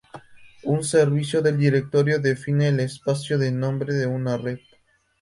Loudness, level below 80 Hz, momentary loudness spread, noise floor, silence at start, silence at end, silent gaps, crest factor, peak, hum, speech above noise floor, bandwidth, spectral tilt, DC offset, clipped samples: -22 LUFS; -60 dBFS; 7 LU; -62 dBFS; 0.15 s; 0.65 s; none; 16 dB; -6 dBFS; none; 40 dB; 11.5 kHz; -6.5 dB/octave; under 0.1%; under 0.1%